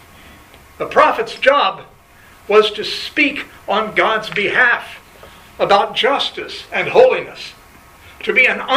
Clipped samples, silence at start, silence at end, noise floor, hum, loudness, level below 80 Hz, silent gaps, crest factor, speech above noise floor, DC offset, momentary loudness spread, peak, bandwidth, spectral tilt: under 0.1%; 0.8 s; 0 s; -45 dBFS; none; -15 LUFS; -52 dBFS; none; 16 dB; 29 dB; under 0.1%; 15 LU; 0 dBFS; 15.5 kHz; -3.5 dB/octave